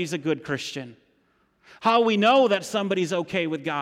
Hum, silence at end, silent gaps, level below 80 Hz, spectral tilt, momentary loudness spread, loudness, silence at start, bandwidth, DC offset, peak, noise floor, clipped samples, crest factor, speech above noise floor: none; 0 s; none; -70 dBFS; -5 dB/octave; 12 LU; -23 LUFS; 0 s; 15.5 kHz; under 0.1%; -10 dBFS; -66 dBFS; under 0.1%; 14 dB; 43 dB